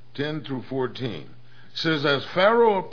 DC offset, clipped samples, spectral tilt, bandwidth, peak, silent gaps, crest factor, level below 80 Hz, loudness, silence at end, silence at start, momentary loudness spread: 1%; under 0.1%; -6.5 dB/octave; 5.4 kHz; -6 dBFS; none; 18 dB; -68 dBFS; -24 LUFS; 0 s; 0.15 s; 15 LU